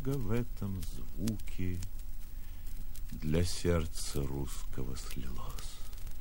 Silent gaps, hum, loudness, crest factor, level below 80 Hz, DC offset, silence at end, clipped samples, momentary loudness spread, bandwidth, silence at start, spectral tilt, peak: none; none; -38 LUFS; 18 dB; -40 dBFS; under 0.1%; 0 s; under 0.1%; 15 LU; 16.5 kHz; 0 s; -5.5 dB/octave; -16 dBFS